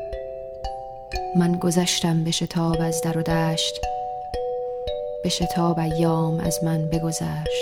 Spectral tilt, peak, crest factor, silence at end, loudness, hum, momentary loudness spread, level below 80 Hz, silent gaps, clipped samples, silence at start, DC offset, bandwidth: -5 dB/octave; -8 dBFS; 16 dB; 0 s; -24 LUFS; none; 12 LU; -42 dBFS; none; under 0.1%; 0 s; under 0.1%; 16.5 kHz